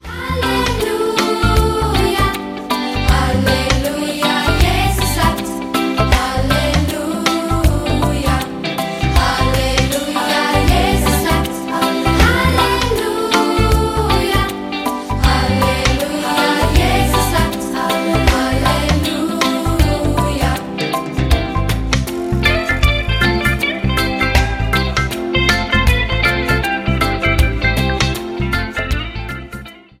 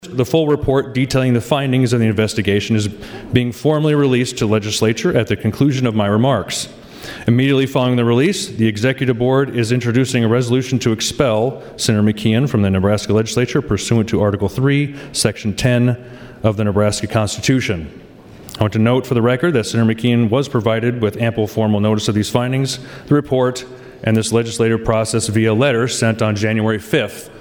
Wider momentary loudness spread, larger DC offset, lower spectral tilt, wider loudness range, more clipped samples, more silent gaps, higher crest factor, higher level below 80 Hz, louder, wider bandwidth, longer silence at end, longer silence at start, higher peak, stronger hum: about the same, 6 LU vs 5 LU; neither; about the same, -5 dB/octave vs -5.5 dB/octave; about the same, 2 LU vs 2 LU; neither; neither; about the same, 16 dB vs 16 dB; first, -22 dBFS vs -42 dBFS; about the same, -16 LUFS vs -16 LUFS; second, 16.5 kHz vs 20 kHz; first, 0.2 s vs 0 s; about the same, 0.05 s vs 0.05 s; about the same, 0 dBFS vs 0 dBFS; neither